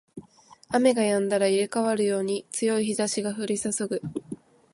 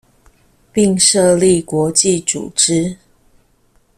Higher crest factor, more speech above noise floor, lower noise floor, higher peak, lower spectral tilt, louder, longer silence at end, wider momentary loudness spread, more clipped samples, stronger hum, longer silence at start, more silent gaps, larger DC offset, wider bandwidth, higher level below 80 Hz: about the same, 18 dB vs 16 dB; second, 29 dB vs 42 dB; about the same, -54 dBFS vs -55 dBFS; second, -8 dBFS vs 0 dBFS; about the same, -4 dB/octave vs -3.5 dB/octave; second, -25 LUFS vs -13 LUFS; second, 0.4 s vs 1.05 s; about the same, 10 LU vs 8 LU; neither; neither; second, 0.15 s vs 0.75 s; neither; neither; second, 11.5 kHz vs 16 kHz; second, -68 dBFS vs -50 dBFS